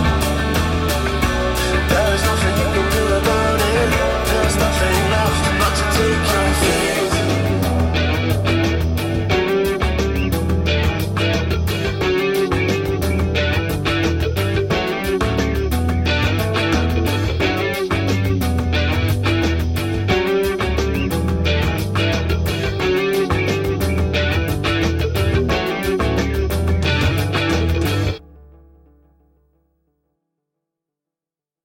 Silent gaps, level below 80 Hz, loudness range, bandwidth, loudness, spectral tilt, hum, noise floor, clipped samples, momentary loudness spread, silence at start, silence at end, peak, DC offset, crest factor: none; -26 dBFS; 3 LU; 17 kHz; -18 LUFS; -5.5 dB/octave; none; -90 dBFS; under 0.1%; 3 LU; 0 s; 3.2 s; -4 dBFS; under 0.1%; 14 dB